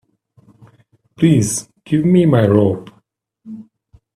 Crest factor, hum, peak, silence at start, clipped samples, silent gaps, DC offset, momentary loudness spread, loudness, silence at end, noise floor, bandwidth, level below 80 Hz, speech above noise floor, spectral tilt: 18 dB; none; 0 dBFS; 1.2 s; under 0.1%; none; under 0.1%; 23 LU; -15 LUFS; 0.55 s; -60 dBFS; 13 kHz; -52 dBFS; 47 dB; -6.5 dB/octave